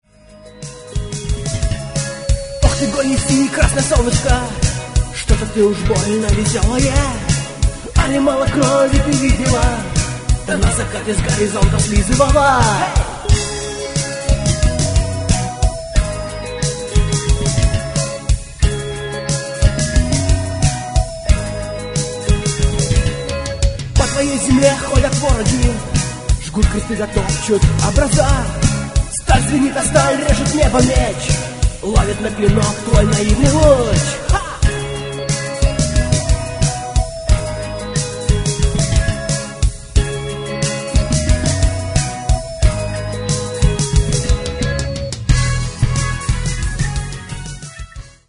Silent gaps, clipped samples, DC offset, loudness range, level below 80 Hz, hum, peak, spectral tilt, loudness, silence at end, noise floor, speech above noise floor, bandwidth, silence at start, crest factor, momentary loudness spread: none; under 0.1%; under 0.1%; 4 LU; -20 dBFS; none; 0 dBFS; -5 dB/octave; -17 LUFS; 0.2 s; -41 dBFS; 27 dB; 11 kHz; 0.3 s; 16 dB; 8 LU